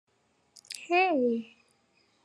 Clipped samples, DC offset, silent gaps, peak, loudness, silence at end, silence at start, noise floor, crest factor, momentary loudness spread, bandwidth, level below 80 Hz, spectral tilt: under 0.1%; under 0.1%; none; -14 dBFS; -27 LUFS; 0.8 s; 0.7 s; -69 dBFS; 18 dB; 18 LU; 12.5 kHz; under -90 dBFS; -3.5 dB/octave